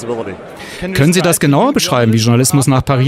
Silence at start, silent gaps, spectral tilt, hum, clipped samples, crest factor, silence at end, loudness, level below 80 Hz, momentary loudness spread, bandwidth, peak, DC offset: 0 s; none; -5 dB/octave; none; under 0.1%; 12 dB; 0 s; -12 LUFS; -40 dBFS; 15 LU; 16 kHz; 0 dBFS; under 0.1%